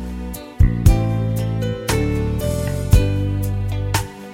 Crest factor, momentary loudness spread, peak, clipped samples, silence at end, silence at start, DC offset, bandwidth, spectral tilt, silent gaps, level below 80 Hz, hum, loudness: 18 dB; 7 LU; 0 dBFS; under 0.1%; 0 s; 0 s; under 0.1%; 17 kHz; -6.5 dB/octave; none; -22 dBFS; none; -20 LUFS